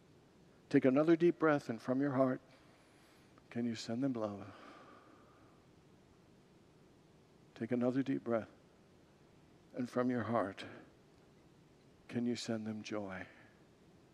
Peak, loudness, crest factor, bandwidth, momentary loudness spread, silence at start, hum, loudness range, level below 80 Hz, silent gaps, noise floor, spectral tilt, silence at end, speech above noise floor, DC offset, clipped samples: -18 dBFS; -36 LUFS; 22 dB; 11.5 kHz; 20 LU; 0.7 s; none; 10 LU; -80 dBFS; none; -65 dBFS; -7 dB/octave; 0.85 s; 30 dB; under 0.1%; under 0.1%